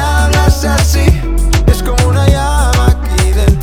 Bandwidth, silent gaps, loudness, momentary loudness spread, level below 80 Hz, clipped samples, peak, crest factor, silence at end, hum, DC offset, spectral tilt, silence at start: 16 kHz; none; -11 LUFS; 3 LU; -12 dBFS; 0.3%; 0 dBFS; 10 dB; 0 s; none; under 0.1%; -5 dB/octave; 0 s